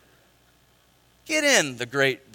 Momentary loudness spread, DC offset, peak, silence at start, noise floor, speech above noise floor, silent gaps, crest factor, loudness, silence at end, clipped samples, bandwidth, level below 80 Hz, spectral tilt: 8 LU; under 0.1%; -2 dBFS; 1.25 s; -61 dBFS; 37 dB; none; 24 dB; -22 LUFS; 0.2 s; under 0.1%; 17 kHz; -68 dBFS; -2 dB/octave